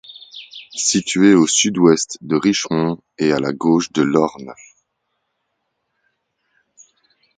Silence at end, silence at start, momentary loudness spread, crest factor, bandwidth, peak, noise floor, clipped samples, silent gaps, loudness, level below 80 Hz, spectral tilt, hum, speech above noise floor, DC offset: 2.85 s; 0.1 s; 22 LU; 18 dB; 9.6 kHz; 0 dBFS; -73 dBFS; under 0.1%; none; -16 LUFS; -58 dBFS; -4 dB/octave; none; 57 dB; under 0.1%